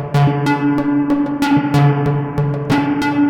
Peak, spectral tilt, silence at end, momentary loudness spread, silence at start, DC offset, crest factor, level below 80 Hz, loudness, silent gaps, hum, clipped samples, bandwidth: -4 dBFS; -7.5 dB/octave; 0 s; 4 LU; 0 s; under 0.1%; 12 dB; -44 dBFS; -16 LUFS; none; none; under 0.1%; 13.5 kHz